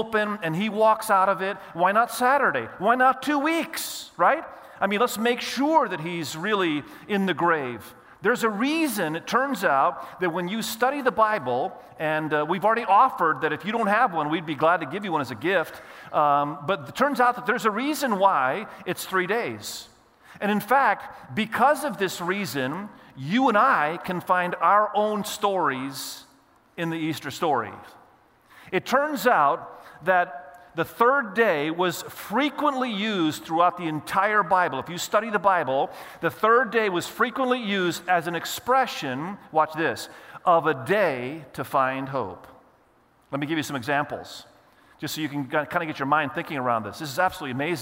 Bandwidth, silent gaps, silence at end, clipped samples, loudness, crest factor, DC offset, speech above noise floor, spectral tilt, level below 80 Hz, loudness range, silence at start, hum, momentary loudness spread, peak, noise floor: 16 kHz; none; 0 s; under 0.1%; -24 LUFS; 18 dB; under 0.1%; 36 dB; -4.5 dB/octave; -68 dBFS; 5 LU; 0 s; none; 11 LU; -6 dBFS; -60 dBFS